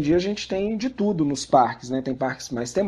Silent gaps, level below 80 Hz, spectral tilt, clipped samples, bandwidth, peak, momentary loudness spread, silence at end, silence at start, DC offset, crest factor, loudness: none; -52 dBFS; -5.5 dB/octave; under 0.1%; 12 kHz; -4 dBFS; 8 LU; 0 s; 0 s; under 0.1%; 18 dB; -24 LUFS